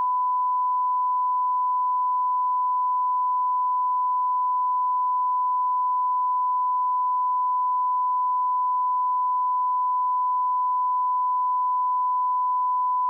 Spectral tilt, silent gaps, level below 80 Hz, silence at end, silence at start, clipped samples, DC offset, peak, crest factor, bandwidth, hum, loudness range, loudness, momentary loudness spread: 1.5 dB/octave; none; under -90 dBFS; 0 s; 0 s; under 0.1%; under 0.1%; -20 dBFS; 4 dB; 1.2 kHz; none; 0 LU; -23 LUFS; 0 LU